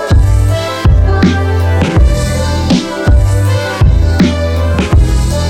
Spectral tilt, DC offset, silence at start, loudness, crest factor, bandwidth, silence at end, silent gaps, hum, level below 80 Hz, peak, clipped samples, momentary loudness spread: -6.5 dB/octave; under 0.1%; 0 s; -11 LUFS; 8 dB; 13.5 kHz; 0 s; none; none; -14 dBFS; 0 dBFS; under 0.1%; 3 LU